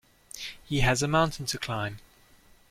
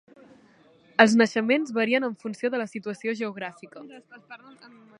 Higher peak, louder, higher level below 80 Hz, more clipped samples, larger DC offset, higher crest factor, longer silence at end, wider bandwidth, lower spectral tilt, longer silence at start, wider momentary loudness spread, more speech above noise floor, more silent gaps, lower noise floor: second, -10 dBFS vs 0 dBFS; second, -28 LUFS vs -24 LUFS; first, -44 dBFS vs -78 dBFS; neither; neither; second, 20 dB vs 26 dB; about the same, 0.7 s vs 0.65 s; first, 16.5 kHz vs 10.5 kHz; about the same, -4.5 dB/octave vs -4.5 dB/octave; second, 0.35 s vs 1 s; second, 16 LU vs 27 LU; about the same, 31 dB vs 32 dB; neither; about the same, -58 dBFS vs -57 dBFS